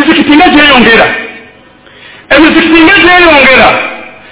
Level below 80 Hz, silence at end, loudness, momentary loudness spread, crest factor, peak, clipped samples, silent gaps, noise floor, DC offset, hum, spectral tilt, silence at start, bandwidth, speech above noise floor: -32 dBFS; 0.2 s; -2 LUFS; 14 LU; 4 dB; 0 dBFS; 20%; none; -35 dBFS; under 0.1%; none; -7.5 dB/octave; 0 s; 4 kHz; 32 dB